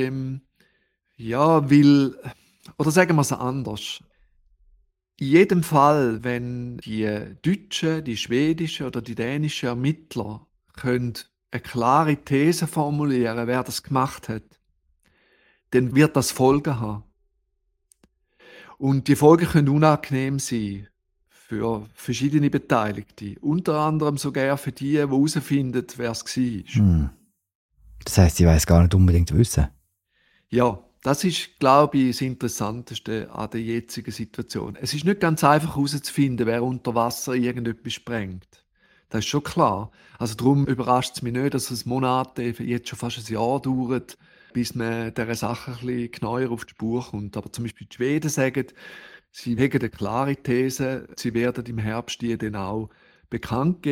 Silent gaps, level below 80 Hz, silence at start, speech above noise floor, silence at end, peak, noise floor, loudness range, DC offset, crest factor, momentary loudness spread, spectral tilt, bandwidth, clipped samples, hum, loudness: 27.55-27.69 s; -40 dBFS; 0 s; 50 dB; 0 s; -2 dBFS; -72 dBFS; 7 LU; under 0.1%; 22 dB; 14 LU; -6 dB/octave; 16.5 kHz; under 0.1%; none; -23 LUFS